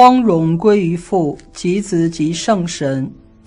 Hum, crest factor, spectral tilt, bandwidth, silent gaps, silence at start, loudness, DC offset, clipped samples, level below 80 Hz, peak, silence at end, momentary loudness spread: none; 14 dB; -6 dB/octave; 11 kHz; none; 0 s; -16 LUFS; under 0.1%; 0.4%; -46 dBFS; 0 dBFS; 0.35 s; 9 LU